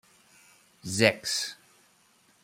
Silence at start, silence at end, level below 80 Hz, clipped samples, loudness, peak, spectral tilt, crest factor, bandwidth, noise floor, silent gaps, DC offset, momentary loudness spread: 0.85 s; 0.9 s; -70 dBFS; under 0.1%; -27 LUFS; -4 dBFS; -3 dB/octave; 28 dB; 16 kHz; -64 dBFS; none; under 0.1%; 14 LU